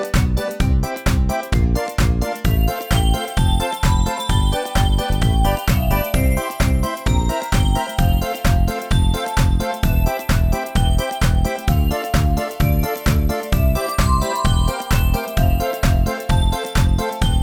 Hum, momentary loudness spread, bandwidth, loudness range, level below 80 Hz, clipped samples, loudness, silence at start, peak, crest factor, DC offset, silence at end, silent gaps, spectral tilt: none; 2 LU; 19 kHz; 1 LU; -20 dBFS; under 0.1%; -19 LUFS; 0 s; -4 dBFS; 14 dB; under 0.1%; 0 s; none; -5.5 dB/octave